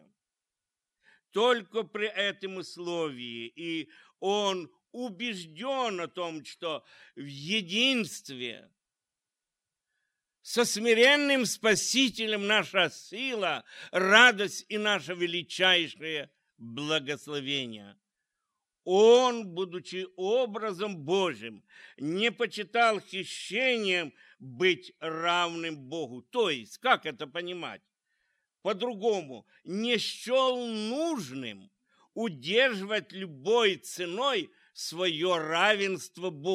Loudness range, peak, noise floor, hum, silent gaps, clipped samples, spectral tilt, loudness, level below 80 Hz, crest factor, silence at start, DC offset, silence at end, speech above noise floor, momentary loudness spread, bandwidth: 8 LU; -4 dBFS; -90 dBFS; none; none; under 0.1%; -3 dB/octave; -28 LUFS; -80 dBFS; 26 dB; 1.35 s; under 0.1%; 0 s; 61 dB; 15 LU; 15.5 kHz